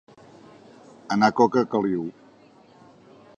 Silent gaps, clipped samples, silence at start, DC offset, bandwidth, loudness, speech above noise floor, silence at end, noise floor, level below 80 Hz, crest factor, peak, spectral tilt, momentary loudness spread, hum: none; under 0.1%; 1.1 s; under 0.1%; 9.6 kHz; -22 LUFS; 32 dB; 1.25 s; -53 dBFS; -66 dBFS; 22 dB; -4 dBFS; -6 dB/octave; 11 LU; none